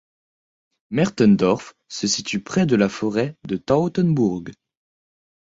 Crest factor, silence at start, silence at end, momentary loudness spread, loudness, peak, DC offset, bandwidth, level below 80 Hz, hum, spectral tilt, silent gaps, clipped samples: 18 dB; 0.9 s; 1 s; 11 LU; -20 LUFS; -4 dBFS; under 0.1%; 8 kHz; -54 dBFS; none; -5.5 dB/octave; none; under 0.1%